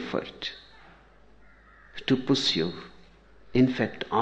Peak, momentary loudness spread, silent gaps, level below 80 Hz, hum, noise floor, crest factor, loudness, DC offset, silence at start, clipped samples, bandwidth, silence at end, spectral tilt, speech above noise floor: -10 dBFS; 21 LU; none; -58 dBFS; none; -56 dBFS; 20 dB; -27 LUFS; under 0.1%; 0 s; under 0.1%; 8.4 kHz; 0 s; -5.5 dB/octave; 30 dB